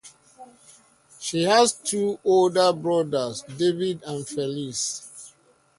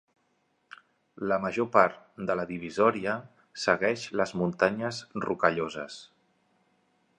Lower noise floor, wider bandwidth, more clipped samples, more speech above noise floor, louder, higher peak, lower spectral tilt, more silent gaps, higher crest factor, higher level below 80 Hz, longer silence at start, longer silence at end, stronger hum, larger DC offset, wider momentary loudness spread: second, -58 dBFS vs -73 dBFS; about the same, 11.5 kHz vs 10.5 kHz; neither; second, 35 dB vs 45 dB; first, -23 LUFS vs -28 LUFS; about the same, -4 dBFS vs -4 dBFS; second, -4 dB/octave vs -5.5 dB/octave; neither; about the same, 20 dB vs 24 dB; about the same, -68 dBFS vs -66 dBFS; second, 0.05 s vs 1.2 s; second, 0.5 s vs 1.15 s; neither; neither; about the same, 13 LU vs 12 LU